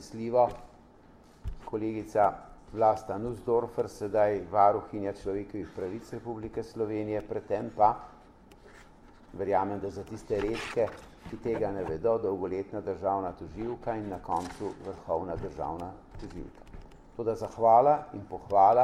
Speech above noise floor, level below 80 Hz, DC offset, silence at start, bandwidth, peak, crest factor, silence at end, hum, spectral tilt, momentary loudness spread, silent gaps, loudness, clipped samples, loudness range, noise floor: 26 dB; -52 dBFS; under 0.1%; 0 s; 12.5 kHz; -8 dBFS; 22 dB; 0 s; none; -7 dB/octave; 18 LU; none; -30 LUFS; under 0.1%; 6 LU; -56 dBFS